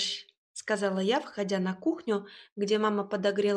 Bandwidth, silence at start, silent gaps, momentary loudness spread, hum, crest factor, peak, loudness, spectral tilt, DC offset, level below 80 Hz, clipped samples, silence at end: 10.5 kHz; 0 s; 0.37-0.55 s, 2.52-2.56 s; 11 LU; none; 16 dB; -14 dBFS; -30 LUFS; -4.5 dB/octave; under 0.1%; -80 dBFS; under 0.1%; 0 s